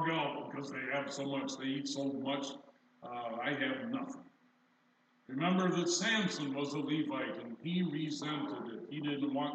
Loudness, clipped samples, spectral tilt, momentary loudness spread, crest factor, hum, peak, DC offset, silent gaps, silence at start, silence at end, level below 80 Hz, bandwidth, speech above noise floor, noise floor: -37 LUFS; under 0.1%; -4.5 dB/octave; 12 LU; 18 dB; none; -20 dBFS; under 0.1%; none; 0 s; 0 s; under -90 dBFS; 9 kHz; 35 dB; -72 dBFS